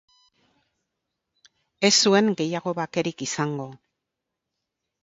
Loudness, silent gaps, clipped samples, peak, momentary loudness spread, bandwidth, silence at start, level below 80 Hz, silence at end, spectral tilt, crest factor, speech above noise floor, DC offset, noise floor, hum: -22 LUFS; none; under 0.1%; -4 dBFS; 12 LU; 7.8 kHz; 1.8 s; -70 dBFS; 1.3 s; -3.5 dB/octave; 22 dB; 61 dB; under 0.1%; -83 dBFS; none